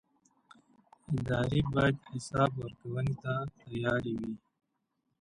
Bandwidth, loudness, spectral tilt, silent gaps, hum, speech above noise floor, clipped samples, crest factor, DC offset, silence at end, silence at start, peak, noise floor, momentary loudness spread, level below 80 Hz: 11 kHz; -33 LUFS; -7 dB/octave; none; none; 49 dB; under 0.1%; 20 dB; under 0.1%; 0.85 s; 1.1 s; -14 dBFS; -81 dBFS; 10 LU; -54 dBFS